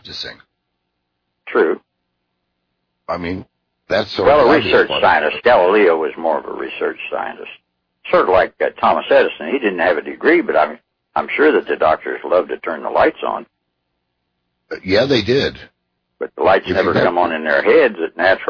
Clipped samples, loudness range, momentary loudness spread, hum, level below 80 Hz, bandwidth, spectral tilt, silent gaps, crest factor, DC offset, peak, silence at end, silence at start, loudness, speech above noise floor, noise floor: under 0.1%; 7 LU; 14 LU; 60 Hz at -60 dBFS; -50 dBFS; 5.4 kHz; -6 dB/octave; none; 14 dB; under 0.1%; -2 dBFS; 0 s; 0.05 s; -16 LUFS; 57 dB; -73 dBFS